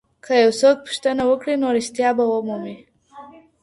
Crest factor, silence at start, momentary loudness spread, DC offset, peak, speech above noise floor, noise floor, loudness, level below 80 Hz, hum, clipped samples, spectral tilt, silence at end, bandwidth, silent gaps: 16 dB; 0.25 s; 10 LU; under 0.1%; -4 dBFS; 25 dB; -43 dBFS; -19 LUFS; -62 dBFS; none; under 0.1%; -4 dB/octave; 0.3 s; 11.5 kHz; none